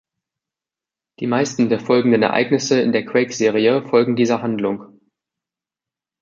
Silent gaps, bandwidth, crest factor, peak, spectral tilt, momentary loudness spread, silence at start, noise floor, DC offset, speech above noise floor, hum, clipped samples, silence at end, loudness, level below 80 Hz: none; 7.6 kHz; 18 dB; -2 dBFS; -5 dB/octave; 6 LU; 1.2 s; -89 dBFS; under 0.1%; 72 dB; none; under 0.1%; 1.35 s; -18 LUFS; -64 dBFS